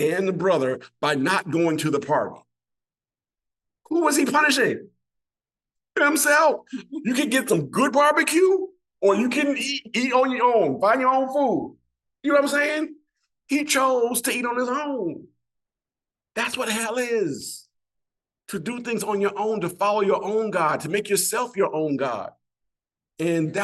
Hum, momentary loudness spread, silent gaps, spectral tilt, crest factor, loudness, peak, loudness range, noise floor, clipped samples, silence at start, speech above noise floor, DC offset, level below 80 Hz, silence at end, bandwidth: none; 12 LU; none; -3.5 dB/octave; 18 dB; -22 LUFS; -6 dBFS; 7 LU; under -90 dBFS; under 0.1%; 0 s; over 68 dB; under 0.1%; -72 dBFS; 0 s; 13 kHz